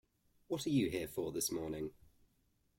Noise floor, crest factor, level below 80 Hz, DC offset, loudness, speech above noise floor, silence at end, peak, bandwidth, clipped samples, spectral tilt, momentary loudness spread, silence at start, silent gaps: -77 dBFS; 18 dB; -66 dBFS; under 0.1%; -39 LUFS; 39 dB; 0.85 s; -24 dBFS; 16.5 kHz; under 0.1%; -4.5 dB/octave; 9 LU; 0.5 s; none